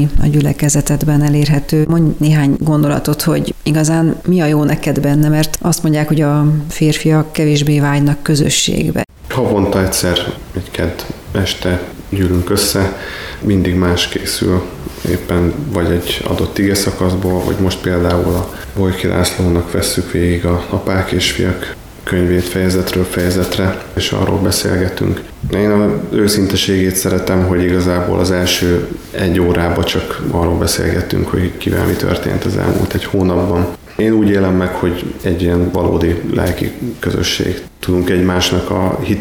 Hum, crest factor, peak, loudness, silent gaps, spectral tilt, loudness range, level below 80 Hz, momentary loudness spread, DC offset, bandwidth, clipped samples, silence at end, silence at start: none; 12 dB; -2 dBFS; -14 LUFS; none; -5.5 dB/octave; 3 LU; -30 dBFS; 6 LU; under 0.1%; 20 kHz; under 0.1%; 0 s; 0 s